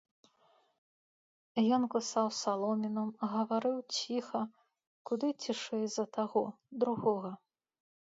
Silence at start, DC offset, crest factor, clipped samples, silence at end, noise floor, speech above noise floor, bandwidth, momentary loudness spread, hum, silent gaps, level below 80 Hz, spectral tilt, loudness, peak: 1.55 s; under 0.1%; 18 dB; under 0.1%; 0.75 s; -70 dBFS; 37 dB; 7.8 kHz; 8 LU; none; 4.87-5.05 s; -84 dBFS; -4.5 dB/octave; -34 LUFS; -18 dBFS